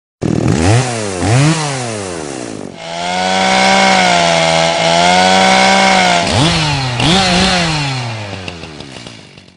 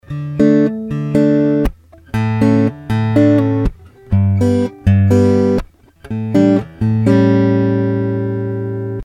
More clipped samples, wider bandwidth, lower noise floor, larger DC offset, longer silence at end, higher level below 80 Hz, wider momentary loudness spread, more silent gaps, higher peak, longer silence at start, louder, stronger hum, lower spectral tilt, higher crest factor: neither; about the same, 11 kHz vs 10 kHz; about the same, -35 dBFS vs -36 dBFS; neither; first, 0.35 s vs 0 s; about the same, -36 dBFS vs -32 dBFS; first, 16 LU vs 10 LU; neither; about the same, 0 dBFS vs 0 dBFS; about the same, 0.2 s vs 0.1 s; first, -11 LUFS vs -15 LUFS; neither; second, -4 dB/octave vs -9 dB/octave; about the same, 12 dB vs 12 dB